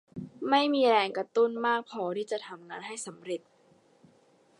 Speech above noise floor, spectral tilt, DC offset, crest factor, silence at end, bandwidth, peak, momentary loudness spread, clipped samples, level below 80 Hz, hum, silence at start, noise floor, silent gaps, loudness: 35 dB; -4 dB/octave; under 0.1%; 20 dB; 1.25 s; 11.5 kHz; -10 dBFS; 16 LU; under 0.1%; -78 dBFS; none; 0.15 s; -63 dBFS; none; -29 LUFS